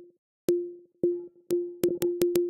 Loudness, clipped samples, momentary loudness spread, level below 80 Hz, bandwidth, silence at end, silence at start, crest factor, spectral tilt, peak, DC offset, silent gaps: -30 LUFS; under 0.1%; 7 LU; -66 dBFS; 17 kHz; 0 s; 0 s; 26 dB; -5.5 dB/octave; -4 dBFS; under 0.1%; 0.18-0.48 s